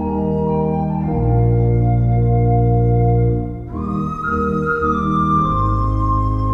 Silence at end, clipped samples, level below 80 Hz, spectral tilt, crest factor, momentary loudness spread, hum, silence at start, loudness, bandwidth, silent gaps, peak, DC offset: 0 s; under 0.1%; -24 dBFS; -10.5 dB/octave; 12 dB; 6 LU; none; 0 s; -17 LUFS; 3.8 kHz; none; -4 dBFS; under 0.1%